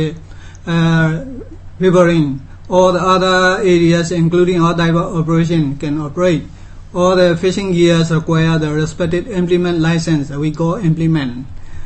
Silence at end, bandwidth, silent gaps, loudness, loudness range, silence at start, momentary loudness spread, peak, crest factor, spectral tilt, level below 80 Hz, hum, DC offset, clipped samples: 0 s; 8.6 kHz; none; -14 LUFS; 3 LU; 0 s; 9 LU; 0 dBFS; 14 dB; -6.5 dB/octave; -34 dBFS; none; under 0.1%; under 0.1%